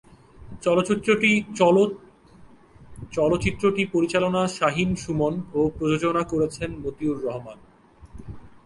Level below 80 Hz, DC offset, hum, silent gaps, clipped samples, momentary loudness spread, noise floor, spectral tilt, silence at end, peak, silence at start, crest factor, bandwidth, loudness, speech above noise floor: -48 dBFS; under 0.1%; none; none; under 0.1%; 14 LU; -50 dBFS; -5.5 dB/octave; 0.15 s; -4 dBFS; 0.4 s; 20 dB; 11.5 kHz; -23 LUFS; 27 dB